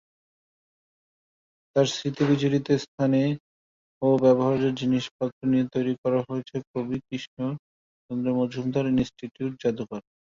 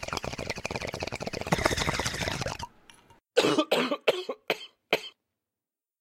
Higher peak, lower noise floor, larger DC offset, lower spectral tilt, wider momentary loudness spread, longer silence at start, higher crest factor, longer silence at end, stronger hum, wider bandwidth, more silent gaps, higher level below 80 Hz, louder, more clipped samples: second, -8 dBFS vs -4 dBFS; about the same, under -90 dBFS vs under -90 dBFS; neither; first, -7 dB/octave vs -3.5 dB/octave; about the same, 11 LU vs 10 LU; first, 1.75 s vs 0 s; second, 18 dB vs 26 dB; second, 0.25 s vs 0.9 s; neither; second, 7.6 kHz vs 16.5 kHz; first, 2.88-2.98 s, 3.40-4.01 s, 5.11-5.19 s, 5.32-5.41 s, 5.98-6.03 s, 6.67-6.74 s, 7.27-7.37 s, 7.59-8.09 s vs none; second, -60 dBFS vs -48 dBFS; first, -26 LUFS vs -29 LUFS; neither